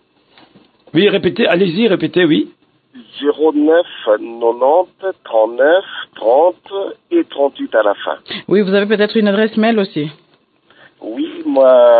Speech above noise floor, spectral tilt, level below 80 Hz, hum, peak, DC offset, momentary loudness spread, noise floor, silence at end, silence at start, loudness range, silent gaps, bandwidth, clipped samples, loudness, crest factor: 41 dB; -9.5 dB/octave; -64 dBFS; none; 0 dBFS; under 0.1%; 12 LU; -54 dBFS; 0 s; 0.95 s; 2 LU; none; 4.8 kHz; under 0.1%; -14 LUFS; 14 dB